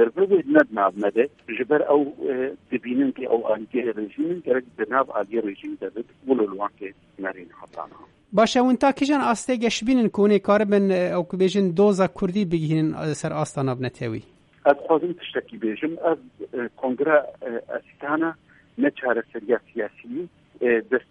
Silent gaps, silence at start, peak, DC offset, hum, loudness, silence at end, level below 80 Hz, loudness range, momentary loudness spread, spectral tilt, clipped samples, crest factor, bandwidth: none; 0 s; -2 dBFS; under 0.1%; none; -23 LUFS; 0.1 s; -60 dBFS; 6 LU; 14 LU; -6 dB/octave; under 0.1%; 20 dB; 11 kHz